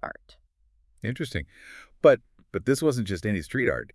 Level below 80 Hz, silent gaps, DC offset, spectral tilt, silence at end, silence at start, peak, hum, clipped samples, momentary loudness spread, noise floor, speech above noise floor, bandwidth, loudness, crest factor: -52 dBFS; none; under 0.1%; -6 dB/octave; 0.1 s; 0.05 s; -6 dBFS; none; under 0.1%; 22 LU; -64 dBFS; 39 dB; 12 kHz; -26 LUFS; 22 dB